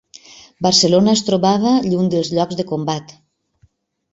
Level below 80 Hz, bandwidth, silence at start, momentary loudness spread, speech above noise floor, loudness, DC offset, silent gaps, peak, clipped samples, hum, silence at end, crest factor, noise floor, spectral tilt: -56 dBFS; 8.2 kHz; 0.6 s; 10 LU; 42 dB; -16 LUFS; under 0.1%; none; -2 dBFS; under 0.1%; none; 1.05 s; 16 dB; -58 dBFS; -5 dB/octave